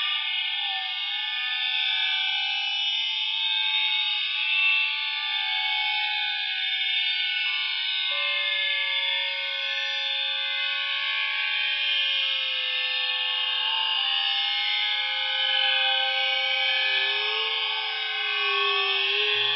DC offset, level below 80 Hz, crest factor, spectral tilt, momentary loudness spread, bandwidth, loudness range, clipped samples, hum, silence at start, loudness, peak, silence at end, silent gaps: under 0.1%; under -90 dBFS; 16 dB; 6.5 dB/octave; 4 LU; 5.8 kHz; 2 LU; under 0.1%; none; 0 s; -23 LUFS; -10 dBFS; 0 s; none